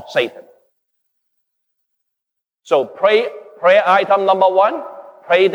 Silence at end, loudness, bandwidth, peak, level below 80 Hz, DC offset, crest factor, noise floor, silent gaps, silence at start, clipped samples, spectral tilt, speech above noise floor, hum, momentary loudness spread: 0 s; -15 LUFS; 10 kHz; -2 dBFS; -78 dBFS; under 0.1%; 16 dB; -81 dBFS; none; 0.05 s; under 0.1%; -5 dB/octave; 67 dB; none; 14 LU